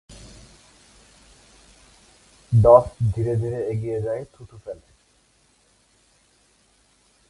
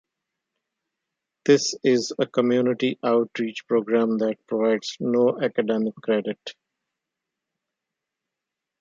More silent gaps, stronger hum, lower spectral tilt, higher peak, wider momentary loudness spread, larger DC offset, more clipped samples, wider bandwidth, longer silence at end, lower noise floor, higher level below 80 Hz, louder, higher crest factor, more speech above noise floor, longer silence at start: neither; neither; first, -9 dB/octave vs -5 dB/octave; first, 0 dBFS vs -4 dBFS; first, 28 LU vs 7 LU; neither; neither; first, 11.5 kHz vs 9.2 kHz; first, 2.55 s vs 2.3 s; second, -61 dBFS vs -86 dBFS; first, -44 dBFS vs -74 dBFS; first, -20 LUFS vs -23 LUFS; about the same, 24 dB vs 20 dB; second, 41 dB vs 63 dB; second, 0.1 s vs 1.45 s